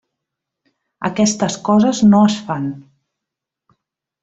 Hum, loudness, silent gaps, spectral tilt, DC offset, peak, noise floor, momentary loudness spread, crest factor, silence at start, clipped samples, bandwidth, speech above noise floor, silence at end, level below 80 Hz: none; -15 LUFS; none; -5.5 dB/octave; under 0.1%; -2 dBFS; -83 dBFS; 14 LU; 16 dB; 1 s; under 0.1%; 8 kHz; 69 dB; 1.4 s; -56 dBFS